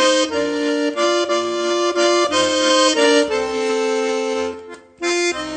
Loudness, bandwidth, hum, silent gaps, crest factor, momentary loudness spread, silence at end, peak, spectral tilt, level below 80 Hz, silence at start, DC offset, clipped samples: -17 LUFS; 9.4 kHz; none; none; 16 dB; 7 LU; 0 s; -2 dBFS; -1.5 dB/octave; -56 dBFS; 0 s; under 0.1%; under 0.1%